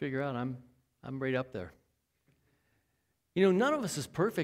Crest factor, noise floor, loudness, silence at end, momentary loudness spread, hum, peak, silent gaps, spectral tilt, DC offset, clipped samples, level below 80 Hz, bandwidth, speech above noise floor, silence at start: 20 dB; -79 dBFS; -32 LUFS; 0 s; 19 LU; none; -14 dBFS; none; -6 dB/octave; under 0.1%; under 0.1%; -68 dBFS; 16 kHz; 47 dB; 0 s